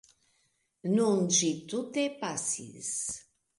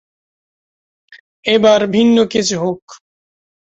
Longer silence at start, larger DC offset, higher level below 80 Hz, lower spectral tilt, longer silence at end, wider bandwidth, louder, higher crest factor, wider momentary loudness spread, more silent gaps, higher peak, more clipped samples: second, 0.85 s vs 1.45 s; neither; second, -72 dBFS vs -56 dBFS; about the same, -3.5 dB/octave vs -4.5 dB/octave; second, 0.35 s vs 0.75 s; first, 11.5 kHz vs 8.2 kHz; second, -30 LUFS vs -13 LUFS; about the same, 18 dB vs 16 dB; about the same, 11 LU vs 11 LU; second, none vs 2.82-2.88 s; second, -14 dBFS vs -2 dBFS; neither